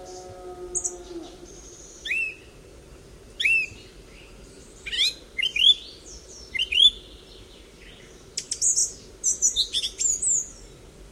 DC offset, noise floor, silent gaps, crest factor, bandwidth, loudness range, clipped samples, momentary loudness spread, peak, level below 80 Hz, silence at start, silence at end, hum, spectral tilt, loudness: under 0.1%; -47 dBFS; none; 22 dB; 16 kHz; 6 LU; under 0.1%; 25 LU; -6 dBFS; -50 dBFS; 0 s; 0.05 s; none; 1.5 dB/octave; -22 LUFS